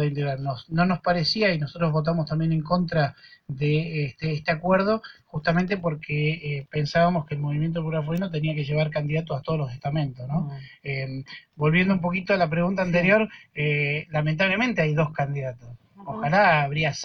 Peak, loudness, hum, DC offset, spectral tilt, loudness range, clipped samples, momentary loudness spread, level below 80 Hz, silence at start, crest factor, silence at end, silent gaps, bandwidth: -8 dBFS; -24 LUFS; none; under 0.1%; -7 dB/octave; 4 LU; under 0.1%; 9 LU; -52 dBFS; 0 s; 16 dB; 0 s; none; 6.6 kHz